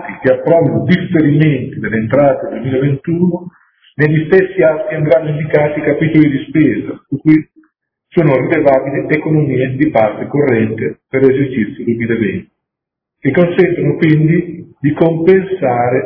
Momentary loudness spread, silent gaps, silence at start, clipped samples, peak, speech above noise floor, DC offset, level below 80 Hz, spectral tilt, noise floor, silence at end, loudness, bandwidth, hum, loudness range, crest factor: 7 LU; none; 0 s; 0.3%; 0 dBFS; 68 dB; under 0.1%; -48 dBFS; -11 dB/octave; -80 dBFS; 0 s; -13 LUFS; 5.4 kHz; none; 2 LU; 12 dB